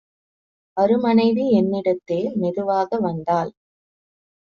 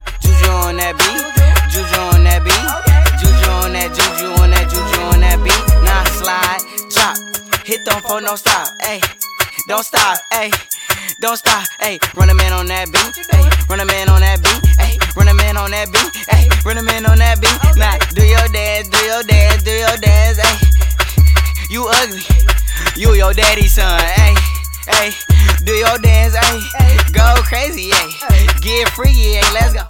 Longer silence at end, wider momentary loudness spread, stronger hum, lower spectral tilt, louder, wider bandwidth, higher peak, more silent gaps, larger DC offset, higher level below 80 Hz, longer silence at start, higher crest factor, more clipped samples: first, 1.05 s vs 0 s; about the same, 7 LU vs 6 LU; neither; first, -6.5 dB/octave vs -3.5 dB/octave; second, -20 LUFS vs -12 LUFS; second, 6.8 kHz vs 17 kHz; second, -6 dBFS vs 0 dBFS; neither; neither; second, -62 dBFS vs -14 dBFS; first, 0.75 s vs 0 s; about the same, 16 dB vs 12 dB; neither